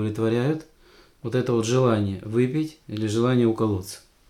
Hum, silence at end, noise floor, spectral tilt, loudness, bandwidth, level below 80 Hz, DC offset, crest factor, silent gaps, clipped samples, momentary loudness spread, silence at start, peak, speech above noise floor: none; 0.3 s; -54 dBFS; -7 dB/octave; -24 LUFS; 15 kHz; -58 dBFS; under 0.1%; 14 dB; none; under 0.1%; 10 LU; 0 s; -10 dBFS; 31 dB